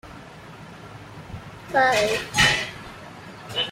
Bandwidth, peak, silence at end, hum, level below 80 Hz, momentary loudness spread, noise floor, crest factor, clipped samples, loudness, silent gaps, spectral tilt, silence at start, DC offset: 16 kHz; -4 dBFS; 0 s; none; -48 dBFS; 23 LU; -42 dBFS; 22 dB; under 0.1%; -21 LUFS; none; -2.5 dB/octave; 0.05 s; under 0.1%